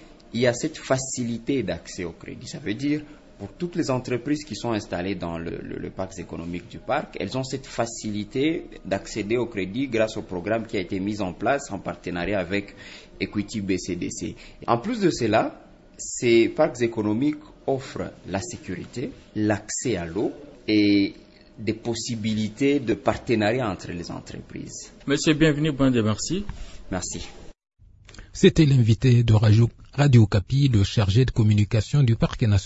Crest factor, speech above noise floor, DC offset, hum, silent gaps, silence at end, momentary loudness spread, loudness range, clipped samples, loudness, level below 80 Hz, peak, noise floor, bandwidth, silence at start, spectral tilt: 22 dB; 23 dB; under 0.1%; none; none; 0 s; 15 LU; 9 LU; under 0.1%; -24 LUFS; -46 dBFS; -2 dBFS; -46 dBFS; 8 kHz; 0 s; -6 dB/octave